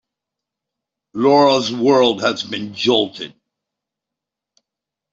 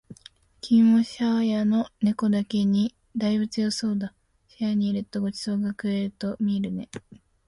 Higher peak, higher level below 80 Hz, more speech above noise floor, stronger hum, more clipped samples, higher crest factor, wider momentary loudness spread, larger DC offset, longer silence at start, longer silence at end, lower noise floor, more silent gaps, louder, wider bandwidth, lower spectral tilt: first, -2 dBFS vs -10 dBFS; about the same, -64 dBFS vs -62 dBFS; first, 69 dB vs 29 dB; neither; neither; about the same, 18 dB vs 14 dB; first, 16 LU vs 11 LU; neither; first, 1.15 s vs 0.1 s; first, 1.85 s vs 0.35 s; first, -85 dBFS vs -53 dBFS; neither; first, -16 LUFS vs -25 LUFS; second, 7.8 kHz vs 11.5 kHz; second, -4.5 dB/octave vs -6.5 dB/octave